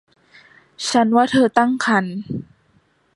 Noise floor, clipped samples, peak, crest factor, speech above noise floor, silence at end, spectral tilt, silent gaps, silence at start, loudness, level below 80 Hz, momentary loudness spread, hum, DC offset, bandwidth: -60 dBFS; under 0.1%; 0 dBFS; 20 dB; 42 dB; 0.75 s; -4.5 dB/octave; none; 0.8 s; -18 LUFS; -58 dBFS; 14 LU; none; under 0.1%; 11.5 kHz